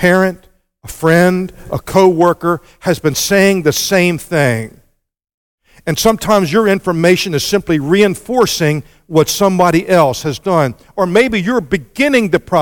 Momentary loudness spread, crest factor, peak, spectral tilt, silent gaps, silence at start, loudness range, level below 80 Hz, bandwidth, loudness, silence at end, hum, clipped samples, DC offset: 8 LU; 14 dB; 0 dBFS; -5 dB/octave; 5.34-5.58 s; 0 s; 2 LU; -42 dBFS; 17.5 kHz; -13 LUFS; 0 s; none; under 0.1%; under 0.1%